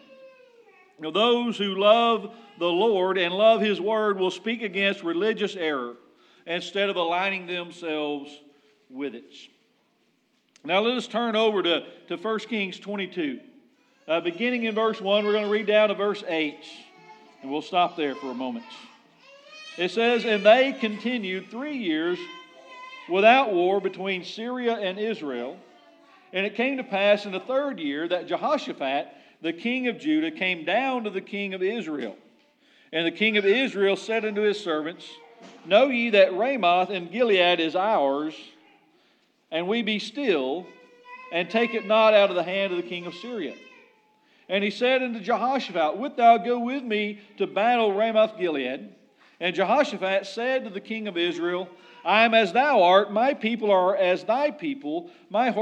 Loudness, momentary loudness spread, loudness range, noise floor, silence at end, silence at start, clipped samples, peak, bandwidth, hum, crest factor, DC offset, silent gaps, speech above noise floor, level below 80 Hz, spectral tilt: -24 LUFS; 14 LU; 7 LU; -68 dBFS; 0 s; 0.2 s; under 0.1%; -4 dBFS; 9 kHz; none; 22 dB; under 0.1%; none; 44 dB; under -90 dBFS; -5 dB/octave